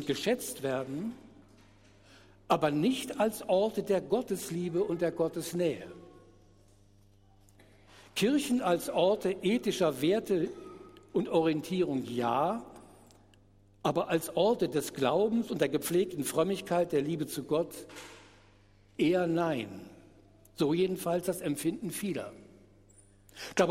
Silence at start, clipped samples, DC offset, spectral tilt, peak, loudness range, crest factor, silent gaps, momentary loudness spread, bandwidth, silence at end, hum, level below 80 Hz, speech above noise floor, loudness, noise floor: 0 s; under 0.1%; under 0.1%; -5 dB/octave; -12 dBFS; 4 LU; 20 dB; none; 13 LU; 16 kHz; 0 s; none; -66 dBFS; 31 dB; -31 LUFS; -61 dBFS